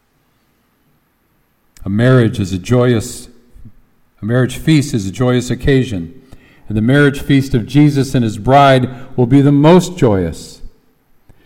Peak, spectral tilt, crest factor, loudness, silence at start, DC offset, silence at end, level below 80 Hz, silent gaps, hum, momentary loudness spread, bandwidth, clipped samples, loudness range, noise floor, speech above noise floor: 0 dBFS; -7 dB/octave; 14 dB; -13 LUFS; 1.8 s; under 0.1%; 0.75 s; -36 dBFS; none; none; 14 LU; 16 kHz; under 0.1%; 5 LU; -59 dBFS; 47 dB